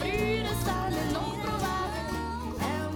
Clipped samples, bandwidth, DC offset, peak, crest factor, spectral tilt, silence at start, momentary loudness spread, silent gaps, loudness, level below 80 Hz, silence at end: under 0.1%; 19 kHz; under 0.1%; -18 dBFS; 14 dB; -5 dB/octave; 0 s; 5 LU; none; -31 LUFS; -42 dBFS; 0 s